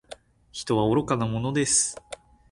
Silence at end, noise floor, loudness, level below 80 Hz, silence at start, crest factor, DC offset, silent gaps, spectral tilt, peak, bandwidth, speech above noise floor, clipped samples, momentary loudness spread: 0.35 s; -48 dBFS; -24 LUFS; -54 dBFS; 0.1 s; 18 dB; under 0.1%; none; -4 dB/octave; -8 dBFS; 11.5 kHz; 24 dB; under 0.1%; 20 LU